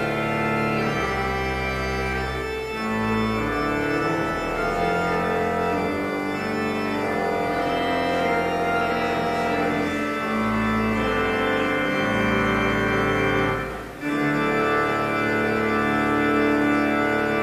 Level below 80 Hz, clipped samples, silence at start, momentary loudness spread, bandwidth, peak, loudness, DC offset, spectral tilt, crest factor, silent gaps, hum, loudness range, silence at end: -40 dBFS; under 0.1%; 0 s; 4 LU; 15 kHz; -8 dBFS; -23 LUFS; under 0.1%; -6 dB/octave; 14 dB; none; none; 3 LU; 0 s